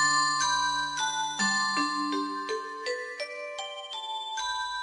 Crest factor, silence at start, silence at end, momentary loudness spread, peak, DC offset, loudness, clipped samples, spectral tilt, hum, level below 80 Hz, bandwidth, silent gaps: 16 dB; 0 s; 0 s; 11 LU; -14 dBFS; under 0.1%; -29 LUFS; under 0.1%; -1 dB/octave; none; -66 dBFS; 10.5 kHz; none